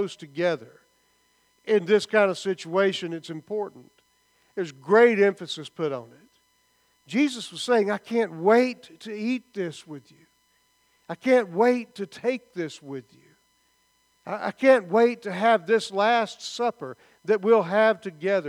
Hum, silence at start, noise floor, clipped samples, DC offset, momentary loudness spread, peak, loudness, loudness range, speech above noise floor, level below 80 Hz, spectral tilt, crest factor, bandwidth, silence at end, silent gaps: none; 0 s; -67 dBFS; under 0.1%; under 0.1%; 18 LU; -6 dBFS; -24 LUFS; 4 LU; 43 dB; -80 dBFS; -5 dB/octave; 20 dB; 12 kHz; 0 s; none